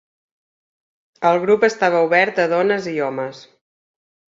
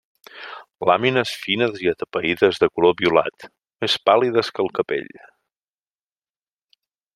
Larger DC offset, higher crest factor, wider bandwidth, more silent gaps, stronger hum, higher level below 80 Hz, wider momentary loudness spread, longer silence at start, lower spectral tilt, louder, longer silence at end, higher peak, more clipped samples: neither; about the same, 18 dB vs 20 dB; second, 7.6 kHz vs 13.5 kHz; neither; neither; about the same, -66 dBFS vs -62 dBFS; second, 9 LU vs 15 LU; first, 1.2 s vs 0.35 s; about the same, -5 dB/octave vs -5 dB/octave; first, -17 LUFS vs -20 LUFS; second, 0.9 s vs 2.15 s; about the same, -2 dBFS vs -2 dBFS; neither